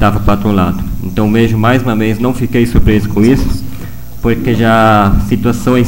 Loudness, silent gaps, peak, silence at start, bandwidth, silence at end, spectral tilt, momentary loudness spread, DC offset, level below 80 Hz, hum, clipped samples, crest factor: -11 LUFS; none; 0 dBFS; 0 s; 17 kHz; 0 s; -7 dB/octave; 10 LU; 7%; -20 dBFS; none; under 0.1%; 10 dB